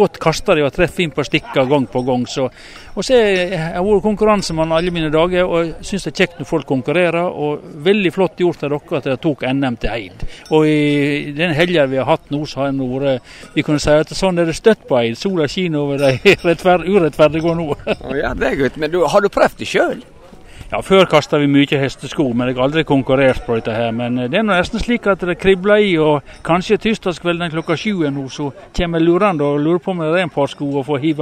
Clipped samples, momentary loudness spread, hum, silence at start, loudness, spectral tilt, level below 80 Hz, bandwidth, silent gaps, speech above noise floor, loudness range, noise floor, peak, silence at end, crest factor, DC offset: under 0.1%; 8 LU; none; 0 s; -16 LUFS; -6 dB/octave; -36 dBFS; 15 kHz; none; 21 dB; 3 LU; -37 dBFS; 0 dBFS; 0 s; 16 dB; under 0.1%